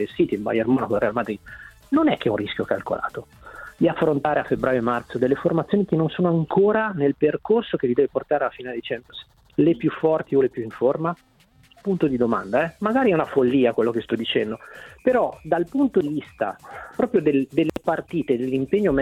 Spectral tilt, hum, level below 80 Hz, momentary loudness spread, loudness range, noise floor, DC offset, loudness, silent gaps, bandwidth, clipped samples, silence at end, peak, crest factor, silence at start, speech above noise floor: -8 dB/octave; none; -54 dBFS; 11 LU; 3 LU; -54 dBFS; under 0.1%; -22 LUFS; none; 12.5 kHz; under 0.1%; 0 s; -6 dBFS; 16 dB; 0 s; 33 dB